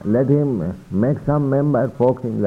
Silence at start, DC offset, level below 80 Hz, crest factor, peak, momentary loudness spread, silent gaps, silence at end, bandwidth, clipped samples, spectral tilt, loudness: 0 s; under 0.1%; -46 dBFS; 14 dB; -4 dBFS; 5 LU; none; 0 s; 4.1 kHz; under 0.1%; -11 dB/octave; -19 LUFS